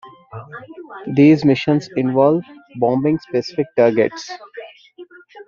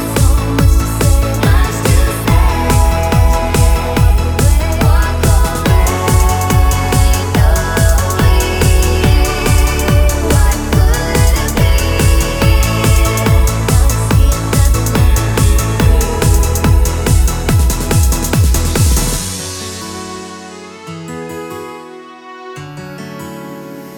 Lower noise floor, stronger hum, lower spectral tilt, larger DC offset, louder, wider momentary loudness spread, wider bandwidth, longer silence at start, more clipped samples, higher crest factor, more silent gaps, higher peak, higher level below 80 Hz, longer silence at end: first, -42 dBFS vs -32 dBFS; neither; first, -6.5 dB/octave vs -5 dB/octave; neither; second, -16 LUFS vs -12 LUFS; first, 23 LU vs 15 LU; second, 7.2 kHz vs over 20 kHz; about the same, 0.05 s vs 0 s; neither; first, 16 dB vs 10 dB; neither; about the same, -2 dBFS vs 0 dBFS; second, -58 dBFS vs -14 dBFS; about the same, 0.05 s vs 0 s